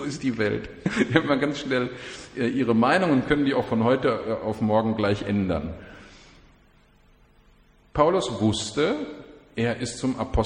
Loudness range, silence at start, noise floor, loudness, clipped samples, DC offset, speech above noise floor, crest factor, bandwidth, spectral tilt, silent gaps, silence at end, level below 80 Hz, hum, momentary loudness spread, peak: 6 LU; 0 s; -57 dBFS; -24 LUFS; under 0.1%; under 0.1%; 33 dB; 22 dB; 10.5 kHz; -6 dB/octave; none; 0 s; -44 dBFS; none; 11 LU; -2 dBFS